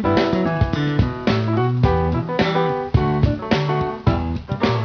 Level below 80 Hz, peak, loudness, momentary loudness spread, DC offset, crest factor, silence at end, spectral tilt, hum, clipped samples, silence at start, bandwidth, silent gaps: -30 dBFS; -4 dBFS; -20 LUFS; 3 LU; under 0.1%; 16 dB; 0 s; -8 dB/octave; none; under 0.1%; 0 s; 5.4 kHz; none